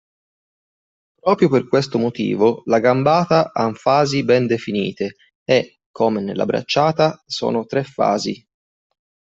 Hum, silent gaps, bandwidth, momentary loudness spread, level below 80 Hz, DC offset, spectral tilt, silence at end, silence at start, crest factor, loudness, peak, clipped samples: none; 5.35-5.46 s, 5.86-5.94 s; 8 kHz; 8 LU; -60 dBFS; under 0.1%; -6 dB/octave; 1 s; 1.25 s; 16 dB; -18 LUFS; -2 dBFS; under 0.1%